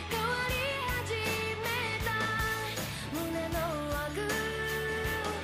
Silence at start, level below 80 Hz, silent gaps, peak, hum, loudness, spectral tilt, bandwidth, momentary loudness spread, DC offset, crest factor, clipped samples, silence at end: 0 s; -46 dBFS; none; -18 dBFS; none; -32 LUFS; -4 dB/octave; 16 kHz; 4 LU; under 0.1%; 14 dB; under 0.1%; 0 s